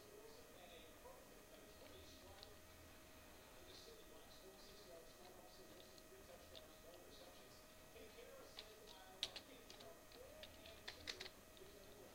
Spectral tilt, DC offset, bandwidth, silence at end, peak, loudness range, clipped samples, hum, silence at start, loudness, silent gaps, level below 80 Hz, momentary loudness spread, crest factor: -2.5 dB/octave; under 0.1%; 16 kHz; 0 s; -26 dBFS; 7 LU; under 0.1%; none; 0 s; -59 LUFS; none; -72 dBFS; 10 LU; 34 dB